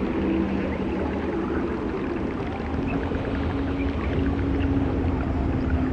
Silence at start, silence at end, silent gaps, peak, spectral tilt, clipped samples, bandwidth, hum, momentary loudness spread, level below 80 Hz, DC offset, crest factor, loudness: 0 s; 0 s; none; -12 dBFS; -9 dB/octave; under 0.1%; 7.2 kHz; none; 4 LU; -32 dBFS; under 0.1%; 14 dB; -26 LUFS